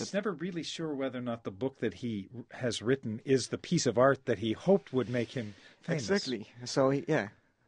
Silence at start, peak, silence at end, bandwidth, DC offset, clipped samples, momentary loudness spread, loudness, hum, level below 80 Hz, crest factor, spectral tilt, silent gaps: 0 s; -12 dBFS; 0.35 s; 10 kHz; under 0.1%; under 0.1%; 11 LU; -32 LUFS; none; -70 dBFS; 20 dB; -5 dB/octave; none